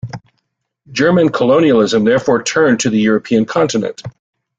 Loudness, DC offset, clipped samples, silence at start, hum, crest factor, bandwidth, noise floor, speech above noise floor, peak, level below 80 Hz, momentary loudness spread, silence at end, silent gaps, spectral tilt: -13 LUFS; under 0.1%; under 0.1%; 0.05 s; none; 12 dB; 9.2 kHz; -70 dBFS; 57 dB; -2 dBFS; -52 dBFS; 16 LU; 0.5 s; none; -5 dB/octave